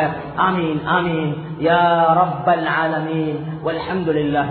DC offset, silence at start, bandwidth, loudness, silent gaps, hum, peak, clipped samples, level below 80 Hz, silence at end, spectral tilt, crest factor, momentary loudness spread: under 0.1%; 0 s; 4.5 kHz; -18 LUFS; none; none; -2 dBFS; under 0.1%; -50 dBFS; 0 s; -11.5 dB/octave; 16 dB; 9 LU